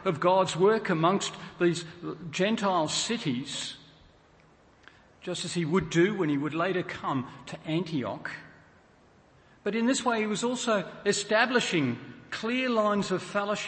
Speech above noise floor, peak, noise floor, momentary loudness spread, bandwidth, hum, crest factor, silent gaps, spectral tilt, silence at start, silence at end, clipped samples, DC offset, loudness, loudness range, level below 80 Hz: 31 dB; -8 dBFS; -59 dBFS; 13 LU; 8.8 kHz; none; 20 dB; none; -4.5 dB/octave; 0 s; 0 s; under 0.1%; under 0.1%; -28 LUFS; 5 LU; -64 dBFS